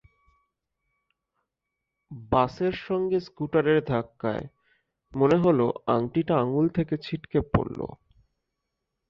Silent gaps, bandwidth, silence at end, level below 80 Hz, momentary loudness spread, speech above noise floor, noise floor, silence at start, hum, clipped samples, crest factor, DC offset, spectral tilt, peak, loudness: none; 7.2 kHz; 1.15 s; -50 dBFS; 13 LU; 59 dB; -84 dBFS; 2.1 s; none; under 0.1%; 22 dB; under 0.1%; -9 dB/octave; -4 dBFS; -26 LUFS